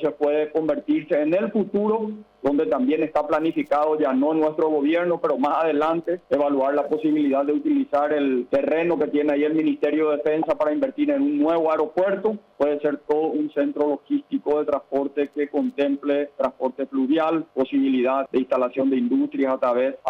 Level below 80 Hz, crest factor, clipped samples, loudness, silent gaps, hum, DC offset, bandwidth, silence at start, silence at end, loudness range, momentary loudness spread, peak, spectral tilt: -64 dBFS; 10 dB; under 0.1%; -22 LUFS; none; none; under 0.1%; 5.8 kHz; 0 s; 0 s; 2 LU; 4 LU; -12 dBFS; -8 dB/octave